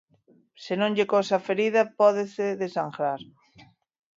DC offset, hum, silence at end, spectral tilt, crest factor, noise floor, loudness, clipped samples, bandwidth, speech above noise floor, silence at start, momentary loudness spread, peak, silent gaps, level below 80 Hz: under 0.1%; none; 0.95 s; -5.5 dB/octave; 20 dB; -62 dBFS; -25 LUFS; under 0.1%; 7.6 kHz; 37 dB; 0.6 s; 9 LU; -6 dBFS; none; -76 dBFS